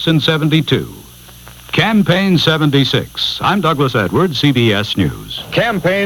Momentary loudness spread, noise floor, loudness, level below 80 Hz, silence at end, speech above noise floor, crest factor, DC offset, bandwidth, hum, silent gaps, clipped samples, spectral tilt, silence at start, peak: 7 LU; -37 dBFS; -14 LUFS; -42 dBFS; 0 s; 23 dB; 14 dB; under 0.1%; 19 kHz; none; none; under 0.1%; -6 dB/octave; 0 s; 0 dBFS